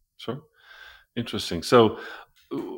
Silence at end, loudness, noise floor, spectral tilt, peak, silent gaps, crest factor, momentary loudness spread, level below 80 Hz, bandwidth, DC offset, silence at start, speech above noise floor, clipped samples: 0 s; -23 LUFS; -49 dBFS; -5.5 dB/octave; -4 dBFS; none; 22 dB; 20 LU; -60 dBFS; 17 kHz; under 0.1%; 0.2 s; 26 dB; under 0.1%